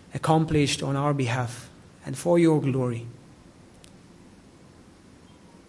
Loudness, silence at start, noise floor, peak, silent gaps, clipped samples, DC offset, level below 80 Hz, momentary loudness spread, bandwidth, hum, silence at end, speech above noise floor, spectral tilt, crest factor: -24 LUFS; 0.15 s; -51 dBFS; -8 dBFS; none; under 0.1%; under 0.1%; -56 dBFS; 17 LU; 12 kHz; none; 2.55 s; 28 dB; -6 dB/octave; 20 dB